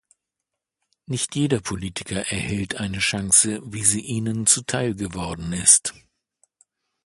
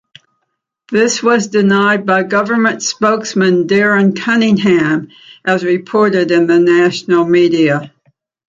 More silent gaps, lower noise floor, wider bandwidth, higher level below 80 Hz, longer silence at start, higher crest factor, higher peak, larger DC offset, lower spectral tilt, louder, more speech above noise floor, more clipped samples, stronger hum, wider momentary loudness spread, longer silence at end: neither; first, -84 dBFS vs -71 dBFS; first, 12 kHz vs 7.8 kHz; first, -48 dBFS vs -56 dBFS; first, 1.1 s vs 0.9 s; first, 24 dB vs 12 dB; about the same, 0 dBFS vs 0 dBFS; neither; second, -2.5 dB/octave vs -5 dB/octave; second, -21 LUFS vs -12 LUFS; about the same, 61 dB vs 59 dB; neither; neither; first, 14 LU vs 5 LU; first, 1.15 s vs 0.6 s